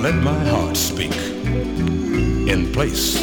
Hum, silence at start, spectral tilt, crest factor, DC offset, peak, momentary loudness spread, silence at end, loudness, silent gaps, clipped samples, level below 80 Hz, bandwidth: none; 0 s; -4.5 dB/octave; 16 dB; under 0.1%; -2 dBFS; 4 LU; 0 s; -20 LUFS; none; under 0.1%; -28 dBFS; over 20 kHz